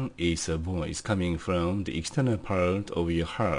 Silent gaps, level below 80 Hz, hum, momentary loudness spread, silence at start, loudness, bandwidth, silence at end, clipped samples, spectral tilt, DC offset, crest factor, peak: none; -48 dBFS; none; 4 LU; 0 s; -29 LUFS; 10.5 kHz; 0 s; under 0.1%; -5.5 dB/octave; under 0.1%; 14 dB; -14 dBFS